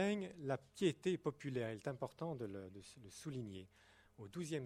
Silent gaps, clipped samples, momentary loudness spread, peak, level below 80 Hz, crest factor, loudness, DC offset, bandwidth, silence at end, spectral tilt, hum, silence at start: none; under 0.1%; 17 LU; -24 dBFS; -76 dBFS; 20 dB; -44 LUFS; under 0.1%; 14.5 kHz; 0 s; -6 dB/octave; none; 0 s